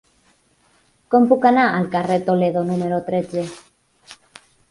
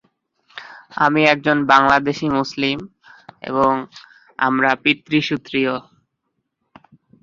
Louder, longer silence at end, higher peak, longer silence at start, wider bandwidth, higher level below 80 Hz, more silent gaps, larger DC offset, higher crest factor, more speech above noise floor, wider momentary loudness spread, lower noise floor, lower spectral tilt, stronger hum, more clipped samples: about the same, -18 LUFS vs -17 LUFS; second, 0.55 s vs 1.45 s; about the same, -2 dBFS vs 0 dBFS; first, 1.1 s vs 0.55 s; first, 11.5 kHz vs 7.6 kHz; about the same, -60 dBFS vs -56 dBFS; neither; neither; about the same, 18 dB vs 20 dB; second, 42 dB vs 57 dB; second, 10 LU vs 23 LU; second, -59 dBFS vs -74 dBFS; first, -7.5 dB/octave vs -5.5 dB/octave; neither; neither